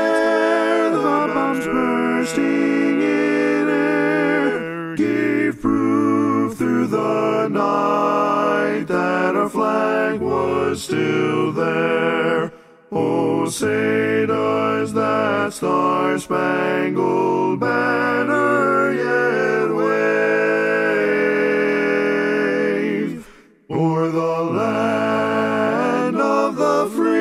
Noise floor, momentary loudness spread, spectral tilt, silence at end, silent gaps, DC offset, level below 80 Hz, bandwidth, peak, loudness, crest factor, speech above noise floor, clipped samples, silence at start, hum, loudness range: -44 dBFS; 3 LU; -6 dB/octave; 0 s; none; under 0.1%; -58 dBFS; 14.5 kHz; -4 dBFS; -19 LUFS; 14 dB; 26 dB; under 0.1%; 0 s; none; 2 LU